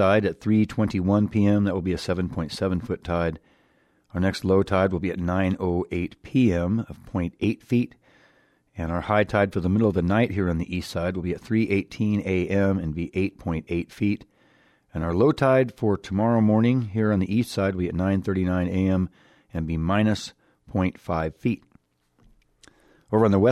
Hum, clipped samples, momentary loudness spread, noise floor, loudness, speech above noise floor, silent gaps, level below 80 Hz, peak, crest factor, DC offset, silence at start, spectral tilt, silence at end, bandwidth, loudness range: none; under 0.1%; 9 LU; -64 dBFS; -24 LUFS; 41 dB; none; -46 dBFS; -8 dBFS; 16 dB; under 0.1%; 0 s; -7.5 dB/octave; 0 s; 13 kHz; 4 LU